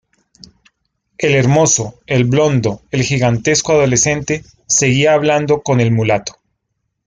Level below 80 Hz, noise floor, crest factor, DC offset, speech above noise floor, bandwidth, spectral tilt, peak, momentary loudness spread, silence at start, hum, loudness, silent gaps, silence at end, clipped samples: -46 dBFS; -71 dBFS; 14 dB; under 0.1%; 58 dB; 9.8 kHz; -4.5 dB/octave; -2 dBFS; 8 LU; 1.2 s; none; -14 LUFS; none; 0.75 s; under 0.1%